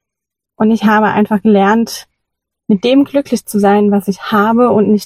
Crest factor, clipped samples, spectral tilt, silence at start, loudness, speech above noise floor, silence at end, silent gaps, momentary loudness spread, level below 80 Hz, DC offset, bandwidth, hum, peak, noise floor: 12 dB; under 0.1%; -6 dB/octave; 0.6 s; -12 LUFS; 71 dB; 0 s; none; 6 LU; -52 dBFS; under 0.1%; 15.5 kHz; none; 0 dBFS; -81 dBFS